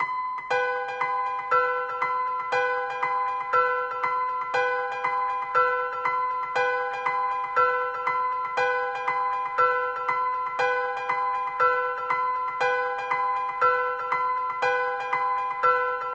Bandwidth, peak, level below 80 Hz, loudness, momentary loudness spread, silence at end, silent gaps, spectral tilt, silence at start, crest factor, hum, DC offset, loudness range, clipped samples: 8 kHz; -10 dBFS; -68 dBFS; -25 LUFS; 4 LU; 0 s; none; -3 dB/octave; 0 s; 16 dB; none; under 0.1%; 1 LU; under 0.1%